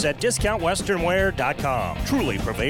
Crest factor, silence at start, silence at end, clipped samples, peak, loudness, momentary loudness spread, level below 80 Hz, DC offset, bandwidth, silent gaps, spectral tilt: 14 dB; 0 s; 0 s; under 0.1%; -10 dBFS; -23 LUFS; 3 LU; -34 dBFS; under 0.1%; 18 kHz; none; -4.5 dB/octave